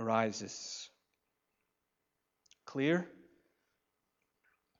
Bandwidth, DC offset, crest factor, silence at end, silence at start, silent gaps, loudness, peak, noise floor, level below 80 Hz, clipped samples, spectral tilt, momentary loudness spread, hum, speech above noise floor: 7.8 kHz; under 0.1%; 24 dB; 1.65 s; 0 s; none; -36 LUFS; -16 dBFS; -85 dBFS; -86 dBFS; under 0.1%; -4.5 dB/octave; 15 LU; none; 50 dB